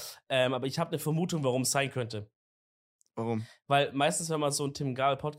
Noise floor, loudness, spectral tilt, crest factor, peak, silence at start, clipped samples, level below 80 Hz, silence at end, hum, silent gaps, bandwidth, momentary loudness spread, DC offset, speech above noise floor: under -90 dBFS; -30 LUFS; -4 dB/octave; 20 dB; -12 dBFS; 0 s; under 0.1%; -70 dBFS; 0 s; none; 2.35-2.99 s; 16 kHz; 9 LU; under 0.1%; over 60 dB